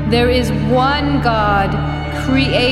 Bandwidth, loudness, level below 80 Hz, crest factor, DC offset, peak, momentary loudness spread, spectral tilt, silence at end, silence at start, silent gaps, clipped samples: 13 kHz; -15 LUFS; -26 dBFS; 14 dB; under 0.1%; -2 dBFS; 6 LU; -6.5 dB/octave; 0 s; 0 s; none; under 0.1%